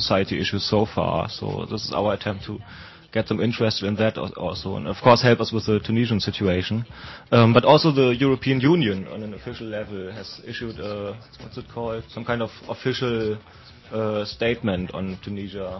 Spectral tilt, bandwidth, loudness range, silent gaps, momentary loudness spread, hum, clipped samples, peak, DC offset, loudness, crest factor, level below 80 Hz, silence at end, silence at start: -6.5 dB/octave; 6.2 kHz; 11 LU; none; 17 LU; none; under 0.1%; -2 dBFS; under 0.1%; -23 LUFS; 20 dB; -46 dBFS; 0 s; 0 s